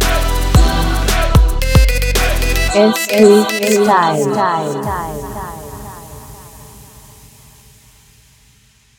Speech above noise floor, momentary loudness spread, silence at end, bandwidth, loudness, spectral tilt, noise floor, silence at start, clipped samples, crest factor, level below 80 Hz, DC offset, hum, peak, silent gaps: 38 dB; 20 LU; 2.15 s; 19.5 kHz; -13 LUFS; -5 dB/octave; -50 dBFS; 0 s; under 0.1%; 14 dB; -18 dBFS; under 0.1%; none; 0 dBFS; none